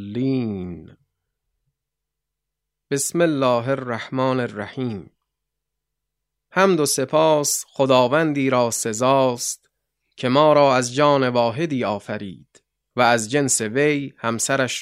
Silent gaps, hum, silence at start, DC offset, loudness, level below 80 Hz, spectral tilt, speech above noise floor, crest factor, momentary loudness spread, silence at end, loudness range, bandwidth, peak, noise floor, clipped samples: none; none; 0 s; under 0.1%; -20 LUFS; -64 dBFS; -4 dB/octave; 63 dB; 20 dB; 12 LU; 0 s; 6 LU; 16 kHz; -2 dBFS; -83 dBFS; under 0.1%